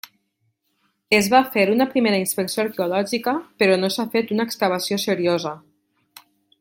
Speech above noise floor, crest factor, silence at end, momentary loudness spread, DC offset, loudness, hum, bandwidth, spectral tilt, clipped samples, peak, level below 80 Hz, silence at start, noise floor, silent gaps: 51 dB; 20 dB; 1.05 s; 7 LU; under 0.1%; -20 LUFS; none; 17 kHz; -4 dB/octave; under 0.1%; -2 dBFS; -66 dBFS; 1.1 s; -71 dBFS; none